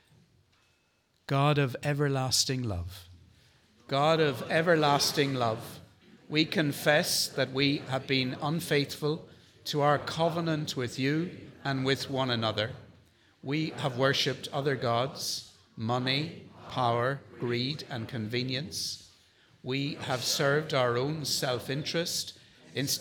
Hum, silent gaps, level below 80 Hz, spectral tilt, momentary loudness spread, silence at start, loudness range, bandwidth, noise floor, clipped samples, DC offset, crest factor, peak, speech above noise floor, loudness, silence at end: none; none; -68 dBFS; -4 dB/octave; 12 LU; 1.3 s; 4 LU; 19 kHz; -71 dBFS; under 0.1%; under 0.1%; 20 dB; -10 dBFS; 42 dB; -29 LUFS; 0 s